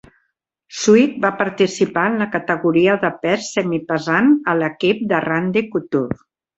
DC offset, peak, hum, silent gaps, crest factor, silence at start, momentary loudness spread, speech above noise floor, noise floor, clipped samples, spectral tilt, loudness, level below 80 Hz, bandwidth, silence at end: under 0.1%; -2 dBFS; none; none; 16 dB; 0.7 s; 7 LU; 54 dB; -71 dBFS; under 0.1%; -5.5 dB/octave; -18 LUFS; -58 dBFS; 8.2 kHz; 0.45 s